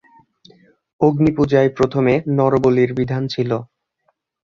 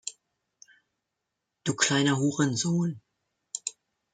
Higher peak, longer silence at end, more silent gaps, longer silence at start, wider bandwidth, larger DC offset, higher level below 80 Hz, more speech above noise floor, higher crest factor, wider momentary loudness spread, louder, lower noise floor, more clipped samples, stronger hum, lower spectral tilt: first, 0 dBFS vs -8 dBFS; first, 0.9 s vs 0.45 s; neither; first, 1 s vs 0.05 s; second, 7.4 kHz vs 9.6 kHz; neither; first, -48 dBFS vs -70 dBFS; second, 51 dB vs 58 dB; about the same, 18 dB vs 22 dB; second, 6 LU vs 16 LU; first, -17 LUFS vs -27 LUFS; second, -67 dBFS vs -84 dBFS; neither; neither; first, -8.5 dB/octave vs -4 dB/octave